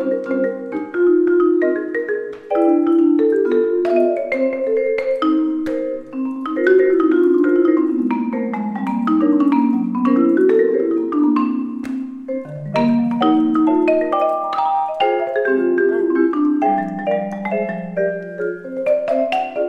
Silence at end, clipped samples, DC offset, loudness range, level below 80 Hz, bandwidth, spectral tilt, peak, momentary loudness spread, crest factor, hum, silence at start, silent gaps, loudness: 0 s; under 0.1%; under 0.1%; 2 LU; -62 dBFS; 5.8 kHz; -8 dB/octave; -4 dBFS; 9 LU; 14 dB; none; 0 s; none; -17 LUFS